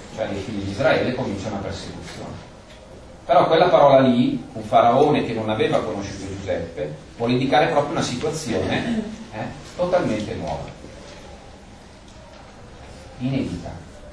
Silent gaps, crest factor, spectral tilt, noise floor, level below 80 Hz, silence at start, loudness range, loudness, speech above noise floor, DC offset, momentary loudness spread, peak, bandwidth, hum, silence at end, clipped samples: none; 20 dB; -6 dB/octave; -43 dBFS; -46 dBFS; 0 s; 14 LU; -21 LUFS; 23 dB; under 0.1%; 24 LU; -2 dBFS; 11 kHz; none; 0 s; under 0.1%